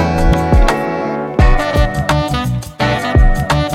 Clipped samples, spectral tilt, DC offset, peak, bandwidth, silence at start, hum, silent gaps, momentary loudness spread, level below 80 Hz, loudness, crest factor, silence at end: under 0.1%; -6 dB/octave; under 0.1%; 0 dBFS; 15 kHz; 0 s; none; none; 5 LU; -16 dBFS; -15 LUFS; 12 dB; 0 s